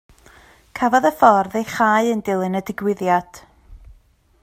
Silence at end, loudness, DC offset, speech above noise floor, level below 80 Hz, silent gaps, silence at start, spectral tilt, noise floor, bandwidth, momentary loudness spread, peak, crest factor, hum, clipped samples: 0.65 s; -18 LUFS; under 0.1%; 37 dB; -52 dBFS; none; 0.75 s; -5.5 dB/octave; -55 dBFS; 16 kHz; 10 LU; 0 dBFS; 20 dB; none; under 0.1%